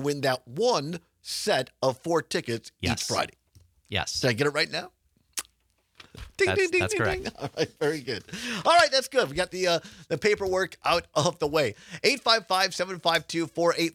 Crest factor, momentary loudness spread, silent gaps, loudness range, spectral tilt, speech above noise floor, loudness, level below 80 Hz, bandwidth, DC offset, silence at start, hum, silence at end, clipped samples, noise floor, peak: 22 dB; 12 LU; none; 4 LU; -3.5 dB/octave; 43 dB; -26 LUFS; -56 dBFS; 18.5 kHz; under 0.1%; 0 s; none; 0.05 s; under 0.1%; -70 dBFS; -4 dBFS